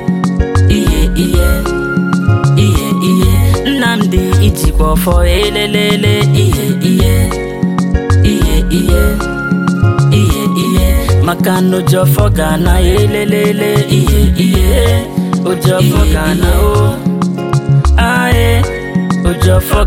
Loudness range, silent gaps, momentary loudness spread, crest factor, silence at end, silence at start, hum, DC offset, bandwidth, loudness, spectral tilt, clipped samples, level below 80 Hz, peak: 1 LU; none; 4 LU; 10 dB; 0 s; 0 s; none; under 0.1%; 17 kHz; -11 LUFS; -6 dB/octave; under 0.1%; -16 dBFS; 0 dBFS